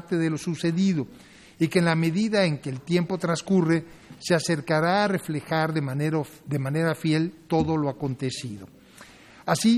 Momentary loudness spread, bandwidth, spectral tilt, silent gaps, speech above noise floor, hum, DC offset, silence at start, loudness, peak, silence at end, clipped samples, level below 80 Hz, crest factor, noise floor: 9 LU; 13.5 kHz; -6 dB/octave; none; 25 dB; none; under 0.1%; 0.05 s; -25 LUFS; -6 dBFS; 0 s; under 0.1%; -58 dBFS; 18 dB; -49 dBFS